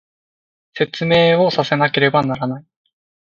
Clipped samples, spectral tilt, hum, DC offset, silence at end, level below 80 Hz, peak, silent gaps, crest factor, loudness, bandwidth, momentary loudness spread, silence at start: under 0.1%; -6.5 dB/octave; none; under 0.1%; 0.75 s; -56 dBFS; -2 dBFS; none; 18 dB; -16 LUFS; 7.4 kHz; 12 LU; 0.75 s